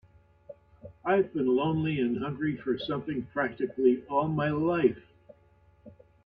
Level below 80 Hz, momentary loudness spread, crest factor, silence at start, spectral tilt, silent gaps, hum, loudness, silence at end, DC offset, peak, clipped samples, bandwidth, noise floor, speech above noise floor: -62 dBFS; 7 LU; 18 dB; 0.5 s; -10 dB/octave; none; none; -29 LUFS; 0.35 s; under 0.1%; -12 dBFS; under 0.1%; 5 kHz; -61 dBFS; 34 dB